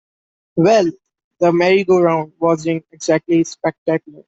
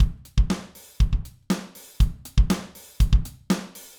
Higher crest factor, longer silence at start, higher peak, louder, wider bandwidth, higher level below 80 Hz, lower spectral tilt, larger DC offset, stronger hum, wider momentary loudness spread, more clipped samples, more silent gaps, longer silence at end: about the same, 14 dB vs 16 dB; first, 0.55 s vs 0 s; first, -2 dBFS vs -6 dBFS; first, -16 LUFS vs -26 LUFS; second, 8 kHz vs over 20 kHz; second, -60 dBFS vs -24 dBFS; about the same, -6 dB/octave vs -6 dB/octave; neither; neither; about the same, 9 LU vs 8 LU; neither; first, 1.24-1.31 s, 3.78-3.86 s vs none; about the same, 0.3 s vs 0.2 s